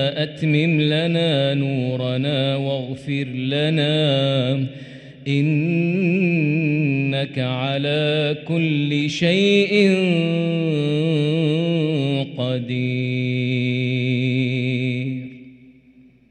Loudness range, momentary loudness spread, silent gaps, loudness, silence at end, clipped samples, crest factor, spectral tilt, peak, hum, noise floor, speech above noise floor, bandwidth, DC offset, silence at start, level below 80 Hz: 3 LU; 7 LU; none; -20 LUFS; 0.8 s; under 0.1%; 16 dB; -7 dB/octave; -4 dBFS; none; -51 dBFS; 32 dB; 9.2 kHz; under 0.1%; 0 s; -62 dBFS